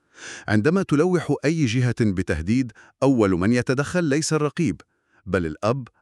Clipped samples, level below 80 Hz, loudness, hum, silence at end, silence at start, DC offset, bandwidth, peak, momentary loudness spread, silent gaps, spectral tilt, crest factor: under 0.1%; -46 dBFS; -22 LUFS; none; 0.15 s; 0.2 s; under 0.1%; 12 kHz; -6 dBFS; 7 LU; none; -6 dB/octave; 16 dB